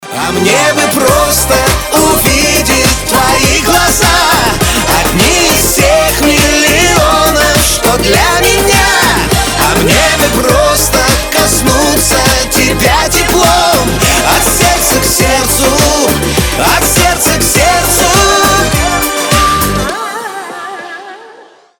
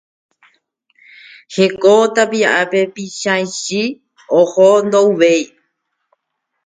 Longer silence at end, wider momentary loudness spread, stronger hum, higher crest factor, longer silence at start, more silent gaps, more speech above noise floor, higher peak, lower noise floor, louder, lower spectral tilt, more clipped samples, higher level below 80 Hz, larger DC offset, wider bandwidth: second, 0.35 s vs 1.2 s; second, 4 LU vs 11 LU; neither; second, 8 dB vs 16 dB; second, 0 s vs 1.5 s; neither; second, 29 dB vs 61 dB; about the same, 0 dBFS vs 0 dBFS; second, -37 dBFS vs -74 dBFS; first, -8 LUFS vs -14 LUFS; about the same, -3 dB/octave vs -4 dB/octave; neither; first, -20 dBFS vs -64 dBFS; neither; first, over 20 kHz vs 9.4 kHz